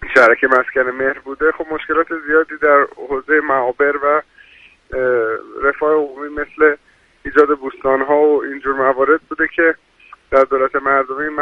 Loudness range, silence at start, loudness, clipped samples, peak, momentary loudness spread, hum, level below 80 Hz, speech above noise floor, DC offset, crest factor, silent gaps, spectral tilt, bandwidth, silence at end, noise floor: 2 LU; 0 s; -16 LUFS; under 0.1%; 0 dBFS; 8 LU; none; -46 dBFS; 31 dB; under 0.1%; 16 dB; none; -6 dB/octave; 7.8 kHz; 0 s; -46 dBFS